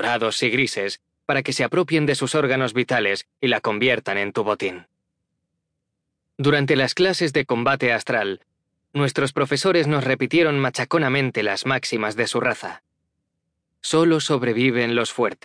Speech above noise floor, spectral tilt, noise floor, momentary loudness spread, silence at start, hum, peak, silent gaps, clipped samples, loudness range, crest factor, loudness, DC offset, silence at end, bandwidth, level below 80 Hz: 58 dB; -5 dB/octave; -79 dBFS; 6 LU; 0 s; none; -6 dBFS; none; under 0.1%; 3 LU; 16 dB; -21 LUFS; under 0.1%; 0.1 s; 10.5 kHz; -64 dBFS